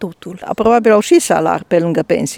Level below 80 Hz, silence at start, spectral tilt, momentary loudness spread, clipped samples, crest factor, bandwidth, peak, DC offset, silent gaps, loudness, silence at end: -48 dBFS; 0 s; -5 dB/octave; 14 LU; under 0.1%; 14 dB; 17.5 kHz; 0 dBFS; under 0.1%; none; -13 LUFS; 0 s